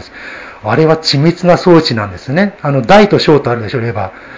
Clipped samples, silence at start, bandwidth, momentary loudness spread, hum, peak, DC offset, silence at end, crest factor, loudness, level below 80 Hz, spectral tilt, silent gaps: 1%; 0 s; 8 kHz; 14 LU; none; 0 dBFS; under 0.1%; 0 s; 10 dB; -10 LUFS; -40 dBFS; -6.5 dB/octave; none